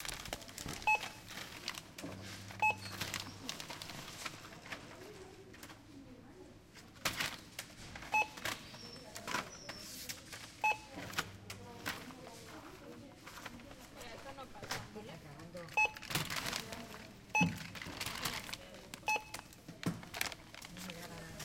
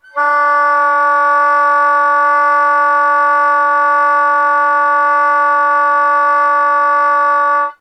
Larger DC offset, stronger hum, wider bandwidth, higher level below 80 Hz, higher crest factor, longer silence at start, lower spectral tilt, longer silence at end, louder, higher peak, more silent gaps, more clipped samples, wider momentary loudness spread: neither; neither; first, 17 kHz vs 9.8 kHz; first, -64 dBFS vs under -90 dBFS; first, 30 dB vs 10 dB; second, 0 s vs 0.15 s; first, -2.5 dB/octave vs -0.5 dB/octave; about the same, 0 s vs 0.1 s; second, -40 LUFS vs -11 LUFS; second, -14 dBFS vs -2 dBFS; neither; neither; first, 19 LU vs 1 LU